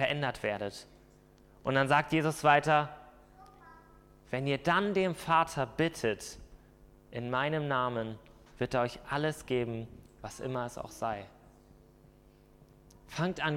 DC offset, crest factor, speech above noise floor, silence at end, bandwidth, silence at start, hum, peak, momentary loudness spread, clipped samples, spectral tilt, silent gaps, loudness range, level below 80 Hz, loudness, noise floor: under 0.1%; 24 dB; 29 dB; 0 s; 16.5 kHz; 0 s; none; -10 dBFS; 17 LU; under 0.1%; -5.5 dB/octave; none; 9 LU; -60 dBFS; -32 LUFS; -60 dBFS